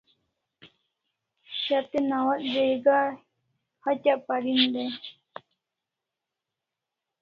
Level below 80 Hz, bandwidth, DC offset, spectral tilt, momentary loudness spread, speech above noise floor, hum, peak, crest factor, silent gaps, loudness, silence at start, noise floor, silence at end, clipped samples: -76 dBFS; 6.6 kHz; under 0.1%; -5.5 dB/octave; 20 LU; 62 dB; none; -8 dBFS; 20 dB; none; -26 LUFS; 0.65 s; -87 dBFS; 2.1 s; under 0.1%